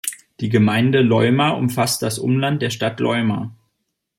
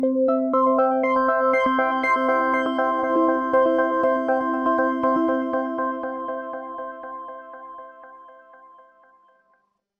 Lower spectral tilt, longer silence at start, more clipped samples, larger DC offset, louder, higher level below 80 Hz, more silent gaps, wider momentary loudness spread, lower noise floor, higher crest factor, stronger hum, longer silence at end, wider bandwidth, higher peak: about the same, -5.5 dB/octave vs -6 dB/octave; about the same, 0.05 s vs 0 s; neither; neither; first, -18 LUFS vs -21 LUFS; about the same, -58 dBFS vs -60 dBFS; neither; second, 10 LU vs 16 LU; first, -74 dBFS vs -67 dBFS; about the same, 18 dB vs 14 dB; neither; second, 0.65 s vs 1.65 s; first, 16.5 kHz vs 6.6 kHz; first, 0 dBFS vs -8 dBFS